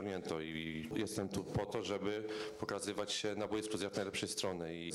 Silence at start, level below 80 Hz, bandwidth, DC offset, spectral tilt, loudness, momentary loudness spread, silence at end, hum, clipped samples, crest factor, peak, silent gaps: 0 s; -64 dBFS; 15.5 kHz; under 0.1%; -4 dB/octave; -40 LUFS; 4 LU; 0 s; none; under 0.1%; 14 dB; -26 dBFS; none